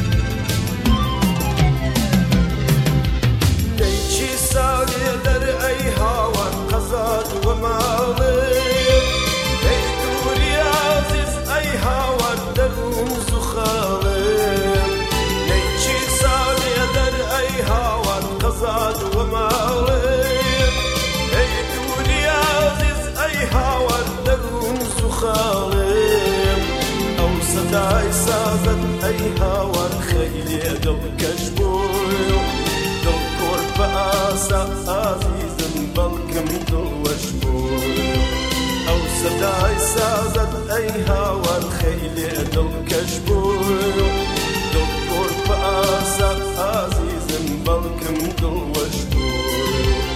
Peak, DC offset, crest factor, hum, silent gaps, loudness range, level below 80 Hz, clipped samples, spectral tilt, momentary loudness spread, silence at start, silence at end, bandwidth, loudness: -2 dBFS; under 0.1%; 16 dB; none; none; 3 LU; -24 dBFS; under 0.1%; -4.5 dB/octave; 5 LU; 0 s; 0 s; 16 kHz; -19 LUFS